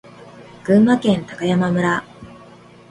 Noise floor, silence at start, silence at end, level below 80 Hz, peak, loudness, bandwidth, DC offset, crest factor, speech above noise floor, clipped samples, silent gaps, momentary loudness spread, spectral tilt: -44 dBFS; 0.2 s; 0.65 s; -54 dBFS; -2 dBFS; -17 LUFS; 11 kHz; under 0.1%; 16 dB; 28 dB; under 0.1%; none; 8 LU; -7 dB/octave